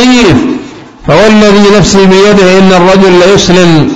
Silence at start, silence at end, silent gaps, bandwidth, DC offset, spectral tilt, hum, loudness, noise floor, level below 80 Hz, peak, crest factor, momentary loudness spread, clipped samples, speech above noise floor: 0 s; 0 s; none; 11 kHz; 6%; -5 dB/octave; none; -3 LUFS; -24 dBFS; -26 dBFS; 0 dBFS; 4 dB; 6 LU; 8%; 21 dB